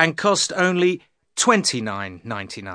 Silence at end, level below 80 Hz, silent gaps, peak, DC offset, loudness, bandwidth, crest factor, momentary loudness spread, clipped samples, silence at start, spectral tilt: 0 s; -64 dBFS; none; 0 dBFS; under 0.1%; -20 LUFS; 10.5 kHz; 22 dB; 14 LU; under 0.1%; 0 s; -3 dB/octave